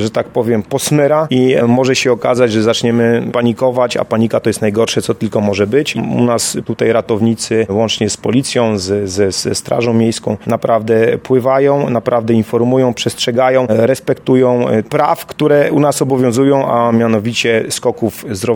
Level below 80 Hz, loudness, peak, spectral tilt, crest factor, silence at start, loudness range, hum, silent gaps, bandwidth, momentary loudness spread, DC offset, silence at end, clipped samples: -50 dBFS; -13 LUFS; 0 dBFS; -5 dB/octave; 12 dB; 0 s; 2 LU; none; none; 18 kHz; 5 LU; under 0.1%; 0 s; under 0.1%